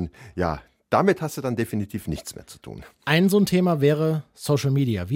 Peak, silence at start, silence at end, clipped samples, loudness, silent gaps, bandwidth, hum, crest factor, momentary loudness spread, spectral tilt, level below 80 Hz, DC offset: -4 dBFS; 0 s; 0 s; under 0.1%; -23 LUFS; none; 17 kHz; none; 18 dB; 17 LU; -6.5 dB/octave; -48 dBFS; under 0.1%